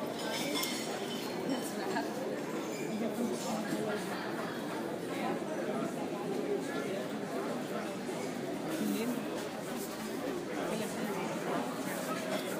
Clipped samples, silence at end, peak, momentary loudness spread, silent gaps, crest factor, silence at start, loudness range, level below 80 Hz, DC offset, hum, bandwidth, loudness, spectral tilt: under 0.1%; 0 s; -18 dBFS; 3 LU; none; 18 dB; 0 s; 1 LU; -76 dBFS; under 0.1%; none; 15.5 kHz; -36 LUFS; -4.5 dB/octave